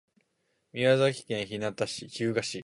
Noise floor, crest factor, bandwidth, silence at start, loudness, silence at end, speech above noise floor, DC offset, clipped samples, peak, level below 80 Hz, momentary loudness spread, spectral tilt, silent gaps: -76 dBFS; 20 dB; 11.5 kHz; 0.75 s; -29 LUFS; 0 s; 47 dB; under 0.1%; under 0.1%; -10 dBFS; -68 dBFS; 10 LU; -5 dB/octave; none